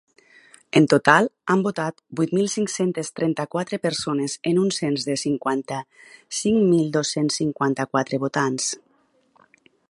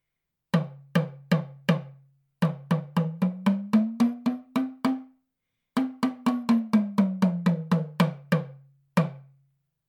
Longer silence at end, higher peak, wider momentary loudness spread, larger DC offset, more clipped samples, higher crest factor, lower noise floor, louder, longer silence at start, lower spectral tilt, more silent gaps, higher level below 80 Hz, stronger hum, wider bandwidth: first, 1.1 s vs 0.65 s; first, 0 dBFS vs -8 dBFS; first, 9 LU vs 6 LU; neither; neither; about the same, 22 dB vs 20 dB; second, -63 dBFS vs -84 dBFS; first, -22 LUFS vs -27 LUFS; first, 0.75 s vs 0.55 s; second, -4.5 dB/octave vs -7.5 dB/octave; neither; first, -64 dBFS vs -74 dBFS; neither; second, 11.5 kHz vs 15.5 kHz